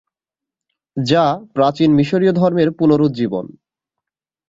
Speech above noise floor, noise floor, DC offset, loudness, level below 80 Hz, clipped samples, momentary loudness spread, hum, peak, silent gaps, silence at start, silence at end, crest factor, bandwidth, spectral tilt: 72 dB; -87 dBFS; under 0.1%; -15 LUFS; -56 dBFS; under 0.1%; 10 LU; none; -2 dBFS; none; 0.95 s; 1 s; 16 dB; 7.8 kHz; -7.5 dB/octave